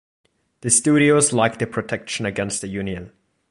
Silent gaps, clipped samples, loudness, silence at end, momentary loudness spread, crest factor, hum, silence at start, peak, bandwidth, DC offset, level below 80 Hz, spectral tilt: none; under 0.1%; -19 LUFS; 0.45 s; 14 LU; 20 dB; none; 0.65 s; -2 dBFS; 11.5 kHz; under 0.1%; -52 dBFS; -4 dB/octave